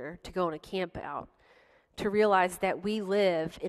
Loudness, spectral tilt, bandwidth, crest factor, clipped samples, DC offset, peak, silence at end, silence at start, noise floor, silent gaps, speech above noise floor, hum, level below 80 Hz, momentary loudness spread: -30 LUFS; -5.5 dB/octave; 13 kHz; 20 dB; under 0.1%; under 0.1%; -12 dBFS; 0 s; 0 s; -62 dBFS; none; 33 dB; none; -60 dBFS; 14 LU